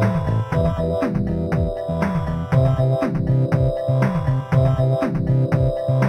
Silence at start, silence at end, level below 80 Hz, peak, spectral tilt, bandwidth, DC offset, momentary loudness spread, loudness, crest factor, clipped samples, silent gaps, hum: 0 s; 0 s; -32 dBFS; -6 dBFS; -9.5 dB/octave; 6.2 kHz; under 0.1%; 4 LU; -20 LUFS; 14 dB; under 0.1%; none; none